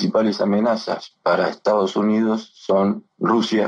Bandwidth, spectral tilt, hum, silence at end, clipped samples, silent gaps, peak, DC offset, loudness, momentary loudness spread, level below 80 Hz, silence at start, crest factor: 7.8 kHz; -6.5 dB/octave; none; 0 s; under 0.1%; none; -6 dBFS; under 0.1%; -20 LUFS; 5 LU; -68 dBFS; 0 s; 12 dB